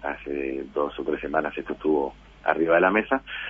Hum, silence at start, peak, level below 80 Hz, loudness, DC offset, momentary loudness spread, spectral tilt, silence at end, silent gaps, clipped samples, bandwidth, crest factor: none; 0 s; -4 dBFS; -52 dBFS; -25 LUFS; under 0.1%; 10 LU; -7.5 dB/octave; 0 s; none; under 0.1%; 5.8 kHz; 22 dB